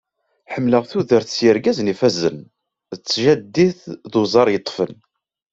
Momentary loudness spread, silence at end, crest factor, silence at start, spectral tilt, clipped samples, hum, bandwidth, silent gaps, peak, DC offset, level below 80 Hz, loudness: 13 LU; 0.6 s; 18 dB; 0.5 s; -5.5 dB/octave; under 0.1%; none; 8 kHz; none; -2 dBFS; under 0.1%; -58 dBFS; -18 LUFS